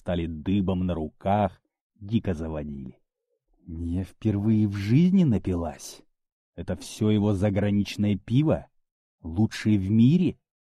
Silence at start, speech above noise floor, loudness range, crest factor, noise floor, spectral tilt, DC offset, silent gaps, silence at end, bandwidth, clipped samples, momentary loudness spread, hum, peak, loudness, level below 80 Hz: 0.05 s; 51 dB; 6 LU; 16 dB; -76 dBFS; -8 dB/octave; under 0.1%; 1.81-1.90 s, 6.32-6.53 s, 8.91-9.18 s; 0.45 s; 13 kHz; under 0.1%; 15 LU; none; -10 dBFS; -25 LUFS; -48 dBFS